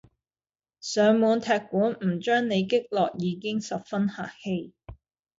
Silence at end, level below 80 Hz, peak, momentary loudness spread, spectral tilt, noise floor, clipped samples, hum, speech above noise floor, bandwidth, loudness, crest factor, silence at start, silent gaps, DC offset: 0.45 s; -60 dBFS; -10 dBFS; 11 LU; -5.5 dB/octave; under -90 dBFS; under 0.1%; none; over 65 dB; 7.8 kHz; -26 LUFS; 16 dB; 0.85 s; none; under 0.1%